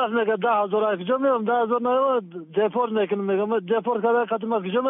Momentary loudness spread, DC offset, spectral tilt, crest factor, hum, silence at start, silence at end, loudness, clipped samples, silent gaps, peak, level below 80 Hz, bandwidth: 3 LU; under 0.1%; -4 dB/octave; 12 dB; none; 0 s; 0 s; -23 LUFS; under 0.1%; none; -10 dBFS; -72 dBFS; 3.9 kHz